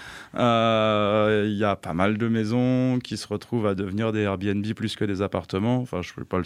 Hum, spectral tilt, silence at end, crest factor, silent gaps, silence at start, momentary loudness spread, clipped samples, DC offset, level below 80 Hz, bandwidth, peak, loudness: none; -7 dB/octave; 0 s; 18 dB; none; 0 s; 8 LU; under 0.1%; under 0.1%; -56 dBFS; 12.5 kHz; -6 dBFS; -24 LUFS